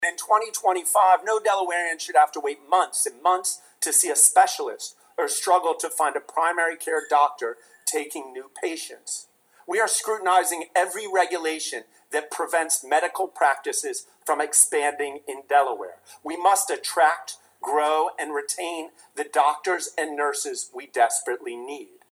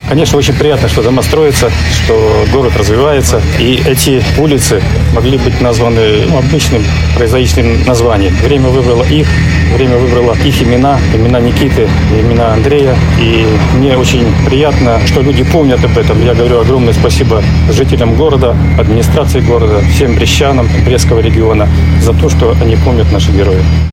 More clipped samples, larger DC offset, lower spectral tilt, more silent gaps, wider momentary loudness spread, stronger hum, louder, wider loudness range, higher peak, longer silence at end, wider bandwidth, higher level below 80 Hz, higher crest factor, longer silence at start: neither; neither; second, 1 dB/octave vs -6 dB/octave; neither; first, 14 LU vs 1 LU; neither; second, -23 LUFS vs -8 LUFS; first, 5 LU vs 1 LU; about the same, 0 dBFS vs 0 dBFS; first, 0.25 s vs 0 s; about the same, 16 kHz vs 15.5 kHz; second, under -90 dBFS vs -14 dBFS; first, 24 dB vs 6 dB; about the same, 0 s vs 0 s